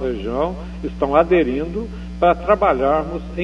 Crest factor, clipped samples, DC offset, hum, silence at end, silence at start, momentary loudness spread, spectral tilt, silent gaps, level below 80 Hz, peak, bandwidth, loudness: 18 dB; under 0.1%; under 0.1%; 60 Hz at -30 dBFS; 0 s; 0 s; 13 LU; -8 dB/octave; none; -32 dBFS; 0 dBFS; 8.4 kHz; -19 LUFS